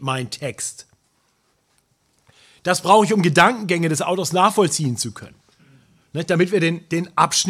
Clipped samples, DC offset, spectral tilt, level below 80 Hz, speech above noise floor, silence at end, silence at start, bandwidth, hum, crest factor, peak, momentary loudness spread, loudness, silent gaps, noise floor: under 0.1%; under 0.1%; -4 dB/octave; -64 dBFS; 46 dB; 0 s; 0 s; 15.5 kHz; none; 20 dB; 0 dBFS; 14 LU; -19 LUFS; none; -65 dBFS